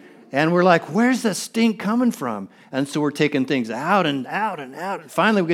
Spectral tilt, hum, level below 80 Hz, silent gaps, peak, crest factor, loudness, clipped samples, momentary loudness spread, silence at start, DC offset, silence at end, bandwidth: -5.5 dB/octave; none; -74 dBFS; none; -2 dBFS; 20 dB; -21 LUFS; under 0.1%; 11 LU; 0.3 s; under 0.1%; 0 s; 15.5 kHz